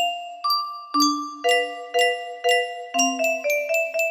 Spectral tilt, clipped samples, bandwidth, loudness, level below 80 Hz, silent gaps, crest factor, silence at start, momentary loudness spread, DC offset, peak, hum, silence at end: 0.5 dB/octave; under 0.1%; 15.5 kHz; -22 LUFS; -76 dBFS; none; 16 dB; 0 s; 5 LU; under 0.1%; -6 dBFS; none; 0 s